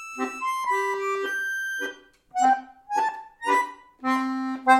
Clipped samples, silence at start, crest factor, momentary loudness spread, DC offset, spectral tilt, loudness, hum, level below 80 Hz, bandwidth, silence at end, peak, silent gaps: under 0.1%; 0 s; 20 dB; 9 LU; under 0.1%; -2 dB/octave; -26 LUFS; none; -70 dBFS; 15.5 kHz; 0 s; -6 dBFS; none